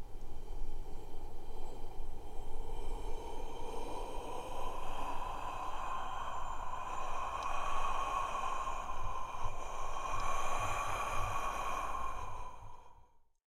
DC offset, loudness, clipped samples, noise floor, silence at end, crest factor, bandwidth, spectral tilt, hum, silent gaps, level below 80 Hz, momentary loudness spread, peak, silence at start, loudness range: under 0.1%; -41 LUFS; under 0.1%; -62 dBFS; 0.3 s; 14 dB; 11 kHz; -3.5 dB/octave; none; none; -42 dBFS; 13 LU; -22 dBFS; 0 s; 8 LU